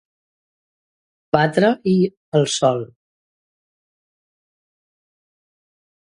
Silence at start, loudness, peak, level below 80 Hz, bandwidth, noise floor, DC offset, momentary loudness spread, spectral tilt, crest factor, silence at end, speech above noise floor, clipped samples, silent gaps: 1.35 s; -18 LUFS; 0 dBFS; -62 dBFS; 11 kHz; under -90 dBFS; under 0.1%; 6 LU; -5.5 dB/octave; 22 dB; 3.3 s; over 73 dB; under 0.1%; 2.17-2.32 s